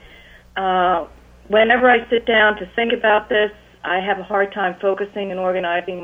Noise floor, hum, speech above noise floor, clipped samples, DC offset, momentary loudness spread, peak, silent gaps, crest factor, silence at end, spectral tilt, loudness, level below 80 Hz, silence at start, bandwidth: -45 dBFS; 60 Hz at -55 dBFS; 27 dB; under 0.1%; under 0.1%; 10 LU; -2 dBFS; none; 16 dB; 0 s; -6 dB/octave; -18 LUFS; -50 dBFS; 0.55 s; 7.2 kHz